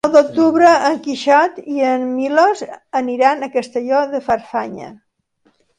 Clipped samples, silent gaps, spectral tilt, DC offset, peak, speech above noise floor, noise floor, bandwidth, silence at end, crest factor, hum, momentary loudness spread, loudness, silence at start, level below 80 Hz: under 0.1%; none; -4 dB/octave; under 0.1%; 0 dBFS; 46 dB; -61 dBFS; 11 kHz; 0.85 s; 16 dB; none; 12 LU; -16 LUFS; 0.05 s; -60 dBFS